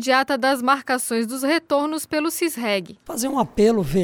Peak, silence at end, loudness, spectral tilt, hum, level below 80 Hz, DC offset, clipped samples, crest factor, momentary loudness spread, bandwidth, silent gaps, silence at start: -4 dBFS; 0 s; -21 LUFS; -4 dB/octave; none; -48 dBFS; under 0.1%; under 0.1%; 16 dB; 6 LU; over 20 kHz; none; 0 s